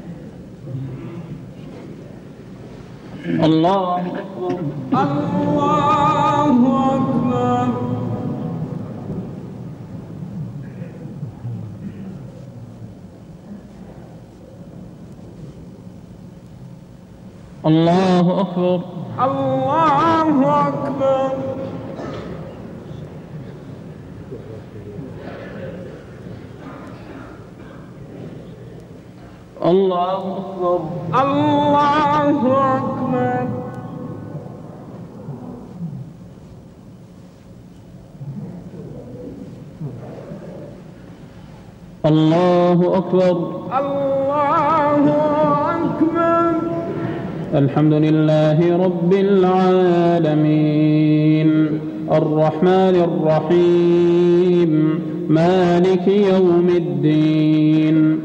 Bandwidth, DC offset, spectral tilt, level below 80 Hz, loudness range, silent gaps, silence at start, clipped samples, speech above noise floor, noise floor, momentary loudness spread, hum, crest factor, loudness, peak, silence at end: 8.2 kHz; under 0.1%; -8.5 dB/octave; -50 dBFS; 20 LU; none; 0 s; under 0.1%; 26 dB; -41 dBFS; 23 LU; none; 14 dB; -17 LUFS; -6 dBFS; 0 s